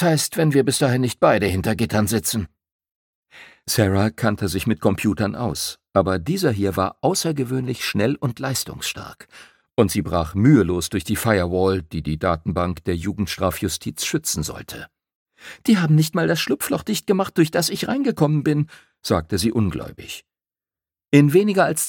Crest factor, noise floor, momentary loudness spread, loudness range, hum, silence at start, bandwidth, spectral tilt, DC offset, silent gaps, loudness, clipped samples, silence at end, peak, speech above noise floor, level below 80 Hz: 20 dB; under -90 dBFS; 10 LU; 3 LU; none; 0 s; 17.5 kHz; -5 dB/octave; under 0.1%; 2.72-2.79 s, 2.91-3.23 s, 15.15-15.26 s; -21 LUFS; under 0.1%; 0 s; -2 dBFS; over 70 dB; -44 dBFS